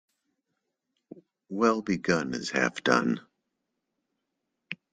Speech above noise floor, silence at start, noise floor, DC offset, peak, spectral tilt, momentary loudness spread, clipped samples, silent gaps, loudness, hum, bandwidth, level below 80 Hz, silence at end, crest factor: 56 dB; 1.5 s; -82 dBFS; under 0.1%; -6 dBFS; -4.5 dB/octave; 14 LU; under 0.1%; none; -27 LUFS; none; 9.4 kHz; -70 dBFS; 0.2 s; 24 dB